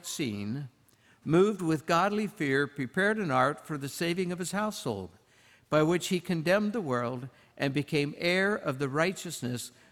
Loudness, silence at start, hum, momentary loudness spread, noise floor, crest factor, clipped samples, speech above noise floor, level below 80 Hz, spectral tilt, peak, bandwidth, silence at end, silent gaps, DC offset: -30 LUFS; 0.05 s; none; 10 LU; -63 dBFS; 18 dB; under 0.1%; 34 dB; -68 dBFS; -5 dB/octave; -12 dBFS; 18.5 kHz; 0.2 s; none; under 0.1%